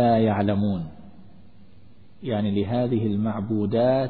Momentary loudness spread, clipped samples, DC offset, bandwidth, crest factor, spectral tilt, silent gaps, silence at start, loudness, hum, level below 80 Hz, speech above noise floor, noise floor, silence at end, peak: 9 LU; under 0.1%; 0.6%; 4.5 kHz; 14 dB; -12 dB/octave; none; 0 s; -24 LUFS; none; -54 dBFS; 31 dB; -53 dBFS; 0 s; -10 dBFS